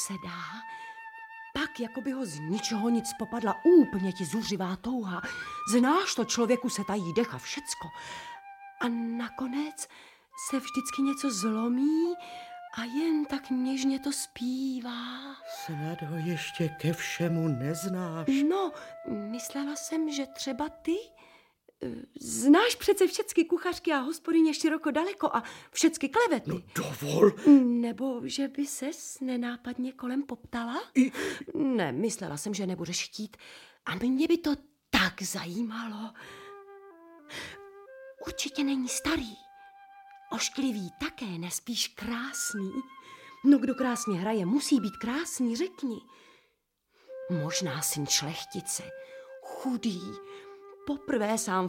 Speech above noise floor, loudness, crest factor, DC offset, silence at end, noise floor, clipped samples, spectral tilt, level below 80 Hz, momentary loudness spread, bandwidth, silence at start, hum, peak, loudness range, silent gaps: 45 dB; -30 LUFS; 22 dB; under 0.1%; 0 s; -75 dBFS; under 0.1%; -4 dB/octave; -62 dBFS; 16 LU; 16.5 kHz; 0 s; none; -8 dBFS; 8 LU; none